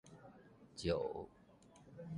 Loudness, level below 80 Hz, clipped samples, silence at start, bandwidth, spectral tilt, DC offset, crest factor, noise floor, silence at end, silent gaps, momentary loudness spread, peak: -43 LUFS; -62 dBFS; under 0.1%; 0.05 s; 11 kHz; -6 dB/octave; under 0.1%; 22 dB; -64 dBFS; 0 s; none; 24 LU; -24 dBFS